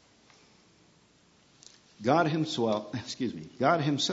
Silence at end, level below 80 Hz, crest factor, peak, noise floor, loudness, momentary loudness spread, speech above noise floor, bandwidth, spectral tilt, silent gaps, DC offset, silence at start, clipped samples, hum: 0 s; -72 dBFS; 22 dB; -10 dBFS; -63 dBFS; -29 LUFS; 9 LU; 35 dB; 8 kHz; -5 dB/octave; none; under 0.1%; 2 s; under 0.1%; none